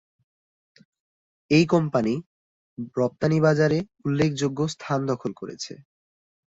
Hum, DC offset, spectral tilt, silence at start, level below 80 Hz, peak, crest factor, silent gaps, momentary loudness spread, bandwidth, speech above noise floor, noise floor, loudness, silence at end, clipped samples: none; under 0.1%; -6.5 dB/octave; 1.5 s; -58 dBFS; -6 dBFS; 20 dB; 2.26-2.77 s; 15 LU; 8 kHz; over 67 dB; under -90 dBFS; -24 LUFS; 0.7 s; under 0.1%